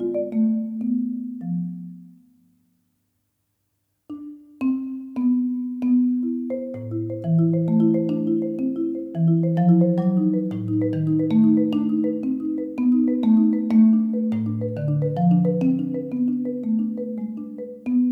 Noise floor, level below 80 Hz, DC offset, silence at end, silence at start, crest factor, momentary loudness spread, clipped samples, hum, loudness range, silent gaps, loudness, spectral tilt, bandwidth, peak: -73 dBFS; -66 dBFS; under 0.1%; 0 s; 0 s; 14 dB; 12 LU; under 0.1%; none; 11 LU; none; -22 LUFS; -11.5 dB/octave; 4.1 kHz; -8 dBFS